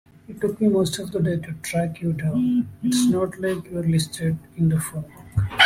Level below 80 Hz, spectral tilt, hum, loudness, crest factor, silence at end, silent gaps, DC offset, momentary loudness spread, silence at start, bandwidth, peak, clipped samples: -48 dBFS; -5 dB/octave; none; -23 LUFS; 20 dB; 0 s; none; under 0.1%; 8 LU; 0.3 s; 15.5 kHz; -2 dBFS; under 0.1%